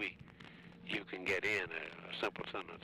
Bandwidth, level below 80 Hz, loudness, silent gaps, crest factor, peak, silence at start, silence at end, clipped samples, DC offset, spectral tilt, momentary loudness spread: 15.5 kHz; -72 dBFS; -39 LUFS; none; 14 dB; -28 dBFS; 0 s; 0 s; under 0.1%; under 0.1%; -4 dB/octave; 20 LU